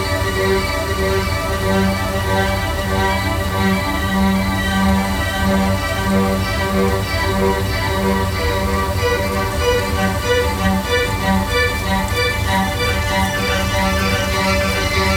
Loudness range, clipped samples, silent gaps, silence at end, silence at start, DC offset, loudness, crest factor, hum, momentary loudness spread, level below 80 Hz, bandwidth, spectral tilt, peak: 1 LU; under 0.1%; none; 0 s; 0 s; under 0.1%; -17 LUFS; 14 dB; none; 2 LU; -26 dBFS; 19 kHz; -5 dB/octave; -2 dBFS